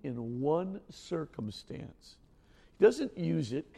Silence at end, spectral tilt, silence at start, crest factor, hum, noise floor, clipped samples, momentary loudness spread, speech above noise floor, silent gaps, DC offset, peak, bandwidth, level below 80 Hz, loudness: 0 s; -7 dB/octave; 0.05 s; 22 dB; none; -61 dBFS; under 0.1%; 19 LU; 29 dB; none; under 0.1%; -12 dBFS; 11.5 kHz; -64 dBFS; -32 LUFS